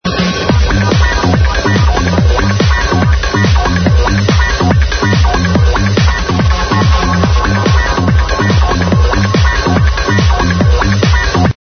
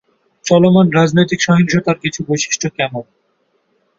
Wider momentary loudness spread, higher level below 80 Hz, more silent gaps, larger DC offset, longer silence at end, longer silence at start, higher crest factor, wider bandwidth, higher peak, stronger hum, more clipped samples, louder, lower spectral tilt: second, 1 LU vs 10 LU; first, -16 dBFS vs -52 dBFS; neither; neither; second, 0.25 s vs 0.95 s; second, 0.05 s vs 0.45 s; about the same, 10 dB vs 14 dB; second, 6.6 kHz vs 7.8 kHz; about the same, 0 dBFS vs 0 dBFS; neither; neither; first, -11 LUFS vs -14 LUFS; about the same, -5.5 dB/octave vs -5 dB/octave